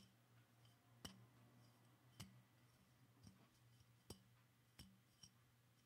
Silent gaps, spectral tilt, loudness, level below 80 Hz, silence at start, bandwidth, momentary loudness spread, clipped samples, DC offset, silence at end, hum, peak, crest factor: none; -4 dB/octave; -65 LUFS; -84 dBFS; 0 s; 15.5 kHz; 8 LU; under 0.1%; under 0.1%; 0 s; none; -38 dBFS; 32 dB